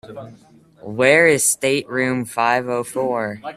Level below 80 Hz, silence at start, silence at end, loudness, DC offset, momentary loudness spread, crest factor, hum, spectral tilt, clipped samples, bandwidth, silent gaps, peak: -60 dBFS; 0.05 s; 0 s; -17 LUFS; under 0.1%; 14 LU; 20 dB; none; -3 dB/octave; under 0.1%; 15 kHz; none; 0 dBFS